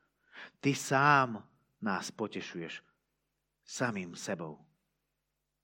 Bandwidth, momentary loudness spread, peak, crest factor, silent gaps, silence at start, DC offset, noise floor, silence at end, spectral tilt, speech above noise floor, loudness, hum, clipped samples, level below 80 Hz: 16.5 kHz; 20 LU; -12 dBFS; 24 dB; none; 0.35 s; under 0.1%; -85 dBFS; 1.1 s; -4.5 dB/octave; 52 dB; -32 LUFS; none; under 0.1%; -80 dBFS